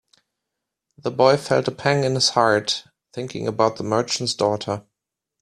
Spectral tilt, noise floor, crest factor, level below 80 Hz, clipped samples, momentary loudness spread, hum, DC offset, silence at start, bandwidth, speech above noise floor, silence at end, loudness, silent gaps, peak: -4 dB/octave; -83 dBFS; 20 dB; -60 dBFS; under 0.1%; 14 LU; none; under 0.1%; 1.05 s; 13.5 kHz; 62 dB; 0.6 s; -21 LUFS; none; -2 dBFS